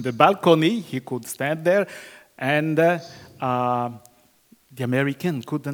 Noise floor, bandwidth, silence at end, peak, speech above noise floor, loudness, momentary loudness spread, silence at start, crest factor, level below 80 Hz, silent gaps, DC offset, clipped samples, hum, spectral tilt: -57 dBFS; over 20 kHz; 0 s; 0 dBFS; 36 dB; -22 LUFS; 13 LU; 0 s; 22 dB; -70 dBFS; none; under 0.1%; under 0.1%; none; -6 dB/octave